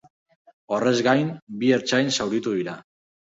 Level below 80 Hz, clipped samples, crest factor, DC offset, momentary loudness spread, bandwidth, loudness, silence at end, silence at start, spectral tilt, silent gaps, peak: -64 dBFS; under 0.1%; 18 dB; under 0.1%; 9 LU; 8 kHz; -23 LUFS; 0.45 s; 0.7 s; -4.5 dB/octave; 1.42-1.47 s; -6 dBFS